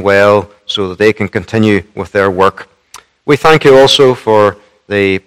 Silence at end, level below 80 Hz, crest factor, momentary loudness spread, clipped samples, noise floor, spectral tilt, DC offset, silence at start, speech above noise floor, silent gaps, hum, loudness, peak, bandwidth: 0.1 s; -46 dBFS; 10 dB; 12 LU; 2%; -39 dBFS; -5 dB/octave; under 0.1%; 0 s; 30 dB; none; none; -10 LUFS; 0 dBFS; 15 kHz